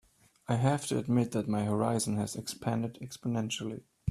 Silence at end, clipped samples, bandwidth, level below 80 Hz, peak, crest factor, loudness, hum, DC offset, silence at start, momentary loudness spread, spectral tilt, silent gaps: 0 s; under 0.1%; 14 kHz; -64 dBFS; -14 dBFS; 18 dB; -32 LUFS; none; under 0.1%; 0.5 s; 10 LU; -5.5 dB/octave; none